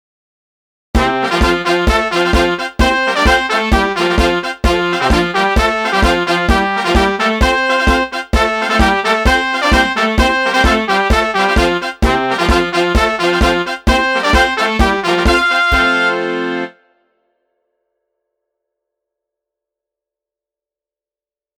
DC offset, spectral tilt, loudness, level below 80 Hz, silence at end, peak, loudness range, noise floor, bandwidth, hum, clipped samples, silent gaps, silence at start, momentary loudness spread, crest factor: under 0.1%; -4.5 dB/octave; -13 LUFS; -22 dBFS; 4.9 s; 0 dBFS; 3 LU; under -90 dBFS; 16.5 kHz; none; under 0.1%; none; 0.95 s; 4 LU; 14 dB